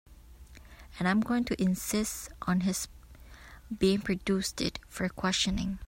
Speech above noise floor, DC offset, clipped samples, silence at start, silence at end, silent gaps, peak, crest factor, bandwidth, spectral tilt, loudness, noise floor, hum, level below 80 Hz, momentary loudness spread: 21 dB; under 0.1%; under 0.1%; 0.1 s; 0 s; none; -14 dBFS; 18 dB; 16.5 kHz; -4.5 dB/octave; -30 LUFS; -51 dBFS; none; -48 dBFS; 11 LU